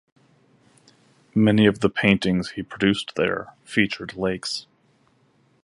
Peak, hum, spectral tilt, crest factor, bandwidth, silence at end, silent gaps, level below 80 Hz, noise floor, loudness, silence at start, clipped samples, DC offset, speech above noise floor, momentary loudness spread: -2 dBFS; none; -6 dB/octave; 22 dB; 11.5 kHz; 1.05 s; none; -52 dBFS; -62 dBFS; -22 LUFS; 1.35 s; under 0.1%; under 0.1%; 40 dB; 11 LU